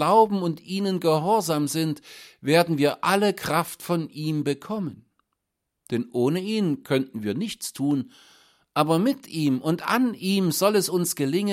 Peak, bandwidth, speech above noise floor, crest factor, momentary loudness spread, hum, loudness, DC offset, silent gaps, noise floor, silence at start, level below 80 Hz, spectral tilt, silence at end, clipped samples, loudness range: -4 dBFS; 16.5 kHz; 58 dB; 20 dB; 9 LU; none; -24 LUFS; under 0.1%; none; -81 dBFS; 0 s; -68 dBFS; -5 dB/octave; 0 s; under 0.1%; 5 LU